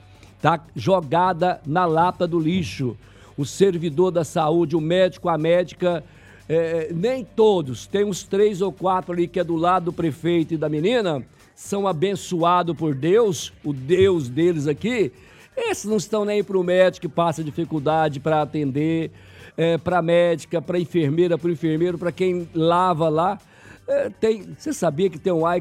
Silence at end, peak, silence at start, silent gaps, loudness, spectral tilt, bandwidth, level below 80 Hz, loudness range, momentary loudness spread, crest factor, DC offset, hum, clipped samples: 0 s; -2 dBFS; 0.45 s; none; -21 LUFS; -6 dB/octave; 14 kHz; -56 dBFS; 2 LU; 8 LU; 20 dB; under 0.1%; none; under 0.1%